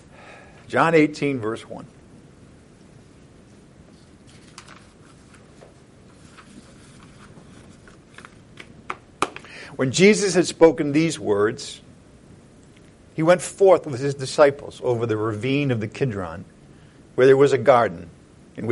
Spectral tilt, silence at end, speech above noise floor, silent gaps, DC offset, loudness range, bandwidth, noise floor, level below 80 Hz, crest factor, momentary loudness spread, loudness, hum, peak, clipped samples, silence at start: -5.5 dB/octave; 0 s; 30 dB; none; under 0.1%; 15 LU; 11.5 kHz; -49 dBFS; -58 dBFS; 22 dB; 20 LU; -20 LUFS; none; -2 dBFS; under 0.1%; 0.3 s